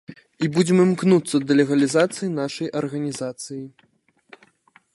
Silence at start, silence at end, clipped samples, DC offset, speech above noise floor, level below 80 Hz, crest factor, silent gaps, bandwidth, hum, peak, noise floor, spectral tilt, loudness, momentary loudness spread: 0.1 s; 1.25 s; under 0.1%; under 0.1%; 38 dB; -66 dBFS; 18 dB; none; 11.5 kHz; none; -4 dBFS; -58 dBFS; -6 dB/octave; -21 LUFS; 14 LU